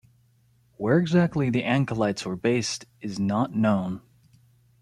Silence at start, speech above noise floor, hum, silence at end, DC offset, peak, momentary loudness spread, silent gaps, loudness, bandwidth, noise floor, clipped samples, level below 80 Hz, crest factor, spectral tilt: 0.8 s; 38 dB; none; 0.85 s; under 0.1%; -8 dBFS; 11 LU; none; -25 LUFS; 11.5 kHz; -62 dBFS; under 0.1%; -60 dBFS; 18 dB; -6 dB/octave